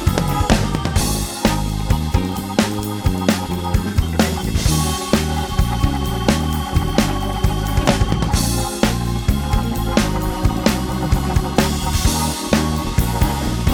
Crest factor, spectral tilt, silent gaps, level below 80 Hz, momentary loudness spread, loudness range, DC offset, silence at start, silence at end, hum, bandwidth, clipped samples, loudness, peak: 18 dB; -5 dB/octave; none; -24 dBFS; 3 LU; 1 LU; under 0.1%; 0 s; 0 s; none; over 20 kHz; under 0.1%; -19 LUFS; 0 dBFS